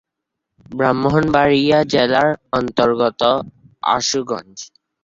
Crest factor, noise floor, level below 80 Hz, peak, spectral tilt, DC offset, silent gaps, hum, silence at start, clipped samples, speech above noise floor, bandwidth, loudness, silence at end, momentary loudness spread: 16 dB; -79 dBFS; -48 dBFS; -2 dBFS; -4.5 dB/octave; under 0.1%; none; none; 0.7 s; under 0.1%; 63 dB; 7.8 kHz; -17 LUFS; 0.4 s; 17 LU